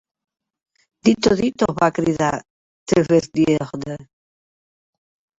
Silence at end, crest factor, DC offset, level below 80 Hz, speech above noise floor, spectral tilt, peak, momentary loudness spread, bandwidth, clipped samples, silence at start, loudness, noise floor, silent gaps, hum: 1.35 s; 18 dB; under 0.1%; -50 dBFS; over 72 dB; -6 dB/octave; -2 dBFS; 14 LU; 8 kHz; under 0.1%; 1.05 s; -19 LUFS; under -90 dBFS; 2.50-2.86 s; none